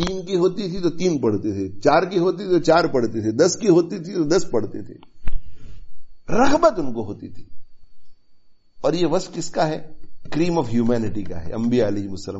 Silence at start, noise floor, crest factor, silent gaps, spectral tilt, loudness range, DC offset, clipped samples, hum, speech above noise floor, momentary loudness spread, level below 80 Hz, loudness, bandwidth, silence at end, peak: 0 s; -51 dBFS; 16 dB; none; -5.5 dB/octave; 6 LU; under 0.1%; under 0.1%; none; 31 dB; 15 LU; -38 dBFS; -21 LUFS; 8 kHz; 0 s; -4 dBFS